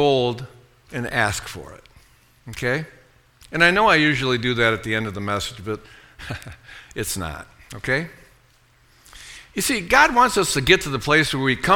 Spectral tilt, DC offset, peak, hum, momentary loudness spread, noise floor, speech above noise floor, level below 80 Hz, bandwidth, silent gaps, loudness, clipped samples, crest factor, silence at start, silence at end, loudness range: -4 dB/octave; under 0.1%; 0 dBFS; none; 22 LU; -57 dBFS; 36 dB; -44 dBFS; 19 kHz; none; -20 LUFS; under 0.1%; 22 dB; 0 s; 0 s; 10 LU